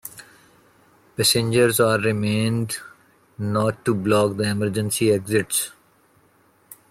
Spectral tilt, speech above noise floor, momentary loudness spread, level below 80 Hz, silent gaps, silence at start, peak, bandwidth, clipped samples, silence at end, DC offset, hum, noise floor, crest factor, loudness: -4.5 dB/octave; 38 dB; 12 LU; -58 dBFS; none; 0.05 s; -6 dBFS; 16.5 kHz; under 0.1%; 0.15 s; under 0.1%; none; -59 dBFS; 18 dB; -21 LUFS